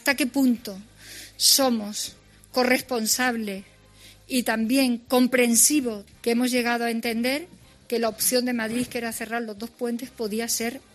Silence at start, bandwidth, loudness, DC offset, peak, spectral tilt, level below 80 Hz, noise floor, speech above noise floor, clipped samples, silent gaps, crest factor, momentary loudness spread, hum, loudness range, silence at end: 0.05 s; 13.5 kHz; -23 LUFS; under 0.1%; -4 dBFS; -2 dB/octave; -60 dBFS; -51 dBFS; 27 dB; under 0.1%; none; 20 dB; 14 LU; none; 5 LU; 0.15 s